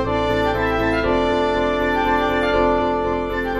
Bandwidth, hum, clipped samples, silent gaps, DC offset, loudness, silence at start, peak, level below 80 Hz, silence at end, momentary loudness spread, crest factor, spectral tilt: 14 kHz; none; under 0.1%; none; under 0.1%; -19 LUFS; 0 s; -4 dBFS; -34 dBFS; 0 s; 3 LU; 14 dB; -6.5 dB/octave